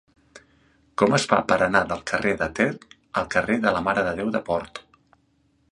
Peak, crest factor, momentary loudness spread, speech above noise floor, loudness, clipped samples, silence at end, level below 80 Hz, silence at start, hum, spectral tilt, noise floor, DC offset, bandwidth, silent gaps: -2 dBFS; 24 dB; 10 LU; 42 dB; -23 LUFS; under 0.1%; 0.9 s; -52 dBFS; 0.35 s; none; -5 dB/octave; -65 dBFS; under 0.1%; 11.5 kHz; none